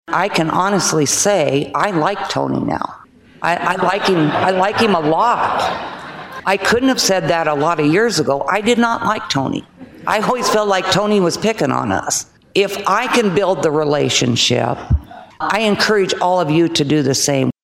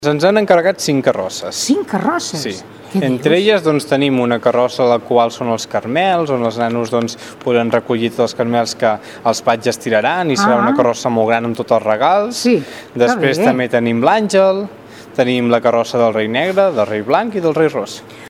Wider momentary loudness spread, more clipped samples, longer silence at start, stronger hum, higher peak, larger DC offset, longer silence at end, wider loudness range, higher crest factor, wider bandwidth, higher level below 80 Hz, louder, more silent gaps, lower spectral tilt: about the same, 7 LU vs 7 LU; neither; about the same, 0.1 s vs 0 s; neither; about the same, -2 dBFS vs 0 dBFS; neither; about the same, 0.1 s vs 0 s; about the same, 1 LU vs 2 LU; about the same, 14 dB vs 14 dB; about the same, 16 kHz vs 16 kHz; first, -38 dBFS vs -60 dBFS; about the same, -16 LUFS vs -15 LUFS; neither; about the same, -4 dB/octave vs -5 dB/octave